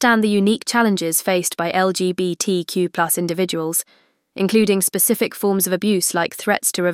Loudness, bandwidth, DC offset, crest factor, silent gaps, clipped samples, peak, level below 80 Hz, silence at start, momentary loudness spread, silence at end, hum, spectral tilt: -18 LUFS; 16.5 kHz; under 0.1%; 16 dB; none; under 0.1%; -4 dBFS; -64 dBFS; 0 s; 5 LU; 0 s; none; -3.5 dB/octave